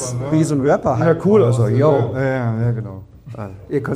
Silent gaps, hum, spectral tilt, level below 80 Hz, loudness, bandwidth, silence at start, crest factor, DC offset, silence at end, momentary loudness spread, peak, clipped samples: none; none; -7.5 dB/octave; -46 dBFS; -17 LUFS; 11 kHz; 0 s; 14 dB; under 0.1%; 0 s; 18 LU; -2 dBFS; under 0.1%